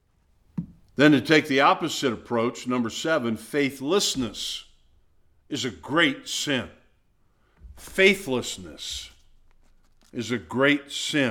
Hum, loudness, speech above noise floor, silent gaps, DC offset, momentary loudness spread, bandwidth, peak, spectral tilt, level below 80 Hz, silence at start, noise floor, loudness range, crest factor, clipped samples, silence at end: none; -24 LUFS; 39 dB; none; under 0.1%; 17 LU; 17.5 kHz; -4 dBFS; -4 dB/octave; -56 dBFS; 0.55 s; -63 dBFS; 5 LU; 22 dB; under 0.1%; 0 s